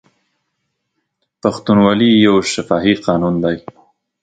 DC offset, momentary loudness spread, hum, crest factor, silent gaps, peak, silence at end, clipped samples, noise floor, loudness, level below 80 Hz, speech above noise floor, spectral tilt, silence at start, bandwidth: under 0.1%; 10 LU; none; 16 dB; none; 0 dBFS; 0.65 s; under 0.1%; -72 dBFS; -14 LUFS; -48 dBFS; 59 dB; -5.5 dB/octave; 1.45 s; 9.2 kHz